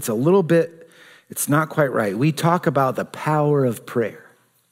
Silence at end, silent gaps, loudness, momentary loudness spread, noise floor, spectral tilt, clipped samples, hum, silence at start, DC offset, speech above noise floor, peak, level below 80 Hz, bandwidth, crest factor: 0.55 s; none; -20 LUFS; 8 LU; -48 dBFS; -6 dB/octave; under 0.1%; none; 0 s; under 0.1%; 28 dB; -4 dBFS; -68 dBFS; 16 kHz; 18 dB